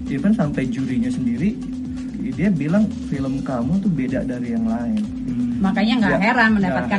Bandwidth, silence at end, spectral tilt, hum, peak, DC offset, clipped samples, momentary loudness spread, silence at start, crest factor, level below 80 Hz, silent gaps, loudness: 10.5 kHz; 0 s; -7 dB/octave; none; -4 dBFS; under 0.1%; under 0.1%; 9 LU; 0 s; 16 dB; -40 dBFS; none; -20 LUFS